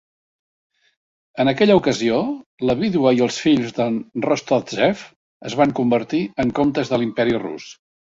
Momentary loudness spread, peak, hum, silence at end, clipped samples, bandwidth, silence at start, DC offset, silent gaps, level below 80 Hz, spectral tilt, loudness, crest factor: 11 LU; -2 dBFS; none; 0.4 s; under 0.1%; 7.8 kHz; 1.35 s; under 0.1%; 2.46-2.58 s, 5.16-5.40 s; -54 dBFS; -5.5 dB/octave; -19 LUFS; 18 dB